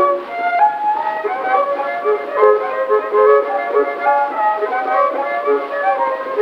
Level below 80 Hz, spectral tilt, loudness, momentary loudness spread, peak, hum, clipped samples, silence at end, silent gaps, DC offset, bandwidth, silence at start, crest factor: -68 dBFS; -4.5 dB/octave; -16 LUFS; 6 LU; 0 dBFS; none; under 0.1%; 0 s; none; under 0.1%; 5.6 kHz; 0 s; 16 dB